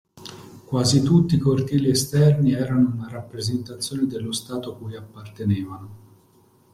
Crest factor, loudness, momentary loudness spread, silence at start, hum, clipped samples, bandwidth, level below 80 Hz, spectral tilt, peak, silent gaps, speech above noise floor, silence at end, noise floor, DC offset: 18 dB; -22 LUFS; 20 LU; 0.15 s; none; under 0.1%; 15 kHz; -52 dBFS; -6 dB/octave; -6 dBFS; none; 36 dB; 0.75 s; -57 dBFS; under 0.1%